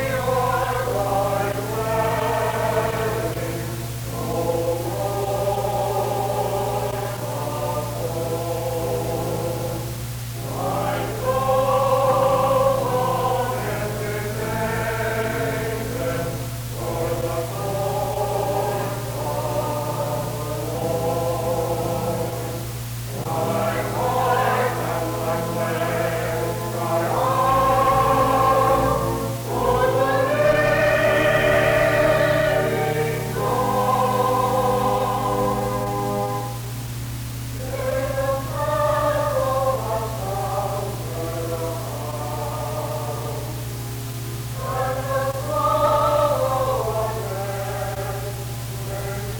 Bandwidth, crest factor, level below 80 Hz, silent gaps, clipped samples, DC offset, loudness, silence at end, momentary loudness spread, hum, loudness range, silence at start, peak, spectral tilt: over 20 kHz; 16 dB; -40 dBFS; none; under 0.1%; under 0.1%; -22 LUFS; 0 s; 11 LU; none; 7 LU; 0 s; -6 dBFS; -5.5 dB/octave